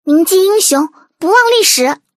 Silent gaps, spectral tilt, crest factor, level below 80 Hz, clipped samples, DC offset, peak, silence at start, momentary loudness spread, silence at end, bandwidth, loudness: none; 0 dB/octave; 12 dB; -72 dBFS; under 0.1%; under 0.1%; 0 dBFS; 0.05 s; 9 LU; 0.25 s; 16 kHz; -10 LUFS